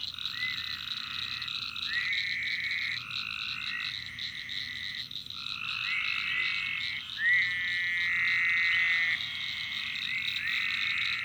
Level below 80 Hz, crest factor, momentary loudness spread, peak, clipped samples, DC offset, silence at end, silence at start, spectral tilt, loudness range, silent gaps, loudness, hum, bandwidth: -66 dBFS; 18 dB; 10 LU; -14 dBFS; under 0.1%; under 0.1%; 0 s; 0 s; -0.5 dB/octave; 6 LU; none; -29 LUFS; none; over 20 kHz